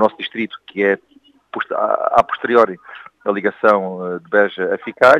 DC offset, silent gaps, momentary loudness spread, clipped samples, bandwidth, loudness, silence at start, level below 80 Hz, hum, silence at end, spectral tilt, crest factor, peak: under 0.1%; none; 12 LU; under 0.1%; 10 kHz; -18 LUFS; 0 s; -60 dBFS; none; 0 s; -6 dB/octave; 18 dB; 0 dBFS